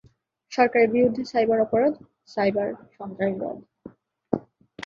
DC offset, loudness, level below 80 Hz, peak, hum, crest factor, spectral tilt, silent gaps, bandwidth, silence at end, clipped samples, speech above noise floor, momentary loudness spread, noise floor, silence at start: under 0.1%; -24 LUFS; -62 dBFS; -4 dBFS; none; 20 dB; -6.5 dB/octave; none; 7.2 kHz; 0.45 s; under 0.1%; 37 dB; 16 LU; -60 dBFS; 0.5 s